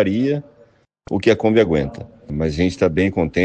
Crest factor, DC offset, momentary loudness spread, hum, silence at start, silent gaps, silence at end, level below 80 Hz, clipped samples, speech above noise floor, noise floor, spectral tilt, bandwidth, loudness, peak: 16 dB; under 0.1%; 12 LU; none; 0 s; none; 0 s; -42 dBFS; under 0.1%; 35 dB; -53 dBFS; -7 dB/octave; 8.8 kHz; -19 LUFS; -2 dBFS